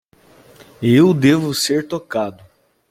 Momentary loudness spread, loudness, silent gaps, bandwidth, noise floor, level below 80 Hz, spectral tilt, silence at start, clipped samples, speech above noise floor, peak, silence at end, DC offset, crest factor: 11 LU; -16 LUFS; none; 16 kHz; -49 dBFS; -56 dBFS; -5.5 dB/octave; 0.8 s; under 0.1%; 34 dB; -2 dBFS; 0.6 s; under 0.1%; 16 dB